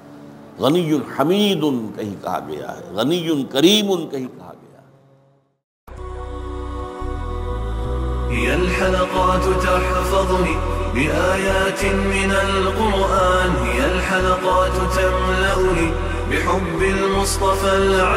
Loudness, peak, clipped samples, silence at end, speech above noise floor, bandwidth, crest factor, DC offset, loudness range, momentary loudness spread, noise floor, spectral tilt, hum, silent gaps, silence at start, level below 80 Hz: -19 LUFS; -2 dBFS; under 0.1%; 0 s; 39 dB; 16 kHz; 18 dB; under 0.1%; 10 LU; 12 LU; -56 dBFS; -5 dB/octave; none; 5.64-5.87 s; 0.05 s; -28 dBFS